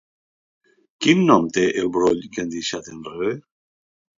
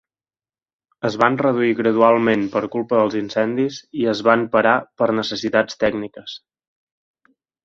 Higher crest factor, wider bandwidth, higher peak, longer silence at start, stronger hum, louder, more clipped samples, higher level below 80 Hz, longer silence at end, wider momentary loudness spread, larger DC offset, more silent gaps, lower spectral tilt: about the same, 22 dB vs 20 dB; about the same, 7.6 kHz vs 7.6 kHz; about the same, 0 dBFS vs 0 dBFS; about the same, 1 s vs 1.05 s; neither; about the same, -20 LUFS vs -19 LUFS; neither; about the same, -58 dBFS vs -60 dBFS; second, 0.75 s vs 1.25 s; first, 14 LU vs 10 LU; neither; neither; about the same, -5 dB/octave vs -6 dB/octave